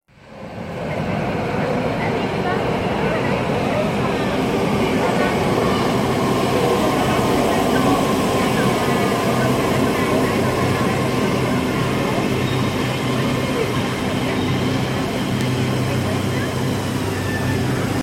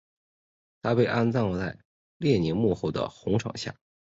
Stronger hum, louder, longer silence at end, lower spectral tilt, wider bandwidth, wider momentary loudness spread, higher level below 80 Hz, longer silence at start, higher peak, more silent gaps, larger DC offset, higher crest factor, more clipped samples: neither; first, -19 LUFS vs -27 LUFS; second, 0 s vs 0.45 s; second, -5.5 dB/octave vs -7 dB/octave; first, 16.5 kHz vs 7.8 kHz; second, 4 LU vs 11 LU; first, -40 dBFS vs -52 dBFS; second, 0.25 s vs 0.85 s; first, -4 dBFS vs -10 dBFS; second, none vs 1.85-2.20 s; neither; about the same, 14 dB vs 18 dB; neither